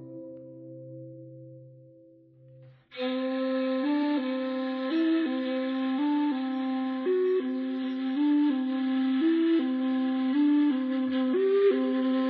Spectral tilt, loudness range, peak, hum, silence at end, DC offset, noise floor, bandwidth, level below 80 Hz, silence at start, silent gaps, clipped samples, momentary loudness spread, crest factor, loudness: -8.5 dB/octave; 8 LU; -14 dBFS; none; 0 s; under 0.1%; -56 dBFS; 5 kHz; -80 dBFS; 0 s; none; under 0.1%; 20 LU; 12 dB; -27 LUFS